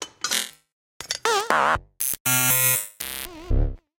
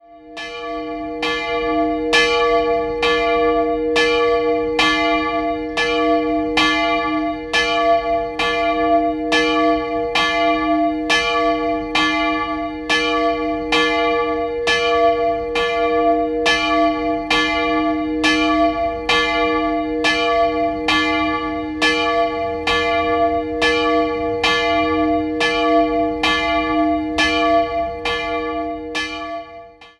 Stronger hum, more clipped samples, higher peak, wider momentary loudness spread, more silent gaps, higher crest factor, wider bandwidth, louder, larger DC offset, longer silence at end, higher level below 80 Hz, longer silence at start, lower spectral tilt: neither; neither; about the same, -2 dBFS vs 0 dBFS; first, 13 LU vs 6 LU; first, 0.72-1.00 s, 2.20-2.25 s vs none; about the same, 22 dB vs 18 dB; first, 17.5 kHz vs 11.5 kHz; second, -22 LUFS vs -17 LUFS; neither; first, 0.25 s vs 0.1 s; first, -32 dBFS vs -40 dBFS; about the same, 0 s vs 0.1 s; second, -2 dB/octave vs -3.5 dB/octave